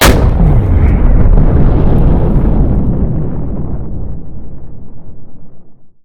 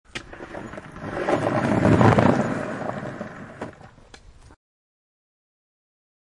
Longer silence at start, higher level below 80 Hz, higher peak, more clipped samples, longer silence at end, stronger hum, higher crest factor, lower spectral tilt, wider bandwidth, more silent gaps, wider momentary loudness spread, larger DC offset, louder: second, 0 s vs 0.15 s; first, -12 dBFS vs -48 dBFS; about the same, 0 dBFS vs -2 dBFS; first, 0.8% vs under 0.1%; second, 0.1 s vs 2.15 s; neither; second, 10 dB vs 22 dB; about the same, -6.5 dB/octave vs -7.5 dB/octave; first, 19 kHz vs 11 kHz; neither; about the same, 19 LU vs 21 LU; neither; first, -12 LUFS vs -21 LUFS